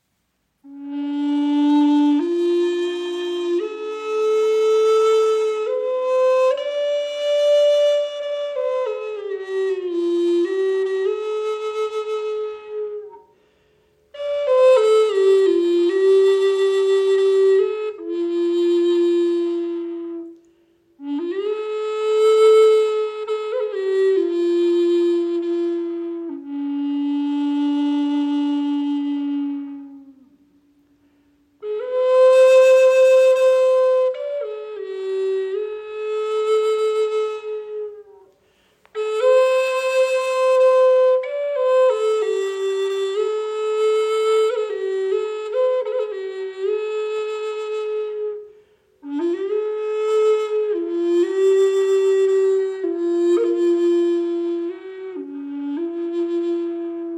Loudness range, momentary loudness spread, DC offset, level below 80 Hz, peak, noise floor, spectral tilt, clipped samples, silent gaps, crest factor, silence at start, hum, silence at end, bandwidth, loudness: 8 LU; 13 LU; under 0.1%; -76 dBFS; -6 dBFS; -70 dBFS; -3 dB/octave; under 0.1%; none; 14 dB; 0.65 s; none; 0 s; 11.5 kHz; -19 LUFS